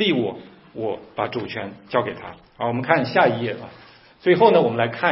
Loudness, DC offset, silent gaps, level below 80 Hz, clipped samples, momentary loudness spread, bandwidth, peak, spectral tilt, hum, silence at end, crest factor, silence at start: -21 LUFS; under 0.1%; none; -62 dBFS; under 0.1%; 20 LU; 5.8 kHz; 0 dBFS; -10 dB/octave; none; 0 s; 20 dB; 0 s